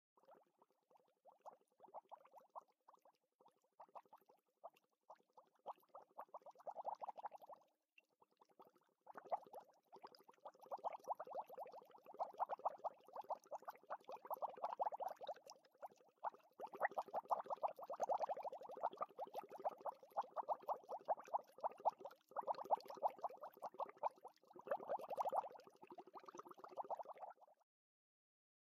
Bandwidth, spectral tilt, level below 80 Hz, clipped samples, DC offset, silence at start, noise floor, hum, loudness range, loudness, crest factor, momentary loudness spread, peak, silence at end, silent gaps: 15 kHz; -3.5 dB/octave; under -90 dBFS; under 0.1%; under 0.1%; 0.3 s; -79 dBFS; none; 17 LU; -49 LUFS; 24 dB; 19 LU; -26 dBFS; 1.1 s; 3.35-3.39 s